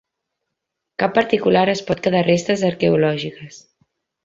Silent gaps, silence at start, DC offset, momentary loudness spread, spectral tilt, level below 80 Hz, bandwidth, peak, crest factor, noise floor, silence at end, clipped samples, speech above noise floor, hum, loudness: none; 1 s; under 0.1%; 11 LU; -6 dB/octave; -56 dBFS; 8 kHz; -2 dBFS; 18 dB; -80 dBFS; 0.65 s; under 0.1%; 62 dB; none; -18 LUFS